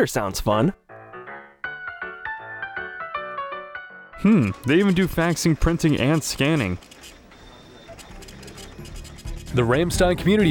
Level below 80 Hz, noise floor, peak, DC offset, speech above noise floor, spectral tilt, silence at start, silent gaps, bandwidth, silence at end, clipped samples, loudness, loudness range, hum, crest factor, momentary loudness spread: -38 dBFS; -46 dBFS; -6 dBFS; under 0.1%; 26 dB; -5.5 dB/octave; 0 s; none; over 20 kHz; 0 s; under 0.1%; -22 LUFS; 11 LU; none; 16 dB; 22 LU